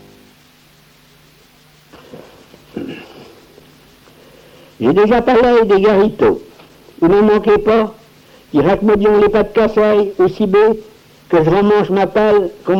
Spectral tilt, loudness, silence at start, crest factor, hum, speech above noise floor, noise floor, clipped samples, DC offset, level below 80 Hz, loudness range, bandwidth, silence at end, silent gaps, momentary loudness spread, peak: -7.5 dB/octave; -12 LUFS; 2.15 s; 12 dB; none; 36 dB; -48 dBFS; under 0.1%; under 0.1%; -40 dBFS; 4 LU; 7.2 kHz; 0 s; none; 13 LU; -2 dBFS